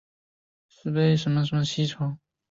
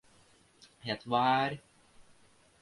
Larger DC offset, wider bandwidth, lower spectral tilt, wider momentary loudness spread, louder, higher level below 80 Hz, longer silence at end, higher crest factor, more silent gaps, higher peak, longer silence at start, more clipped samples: neither; second, 7.8 kHz vs 11.5 kHz; about the same, -6.5 dB/octave vs -5.5 dB/octave; second, 12 LU vs 17 LU; first, -25 LUFS vs -31 LUFS; first, -62 dBFS vs -70 dBFS; second, 0.35 s vs 0.6 s; second, 14 dB vs 20 dB; neither; about the same, -12 dBFS vs -14 dBFS; about the same, 0.85 s vs 0.85 s; neither